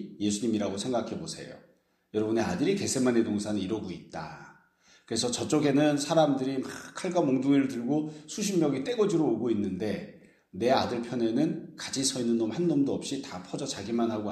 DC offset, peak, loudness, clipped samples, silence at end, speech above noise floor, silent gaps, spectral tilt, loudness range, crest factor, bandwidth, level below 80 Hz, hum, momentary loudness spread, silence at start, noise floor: under 0.1%; -10 dBFS; -29 LUFS; under 0.1%; 0 s; 34 dB; none; -5 dB/octave; 3 LU; 20 dB; 14 kHz; -66 dBFS; none; 13 LU; 0 s; -62 dBFS